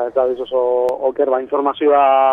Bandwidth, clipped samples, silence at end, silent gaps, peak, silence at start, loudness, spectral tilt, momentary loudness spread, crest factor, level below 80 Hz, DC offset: 5.4 kHz; under 0.1%; 0 s; none; -2 dBFS; 0 s; -16 LUFS; -5.5 dB/octave; 6 LU; 12 dB; -56 dBFS; under 0.1%